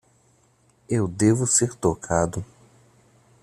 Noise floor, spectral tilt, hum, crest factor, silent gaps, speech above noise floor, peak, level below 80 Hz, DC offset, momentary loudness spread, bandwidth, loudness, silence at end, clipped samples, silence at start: -61 dBFS; -5 dB/octave; none; 20 dB; none; 39 dB; -6 dBFS; -52 dBFS; under 0.1%; 10 LU; 14.5 kHz; -22 LUFS; 1 s; under 0.1%; 0.9 s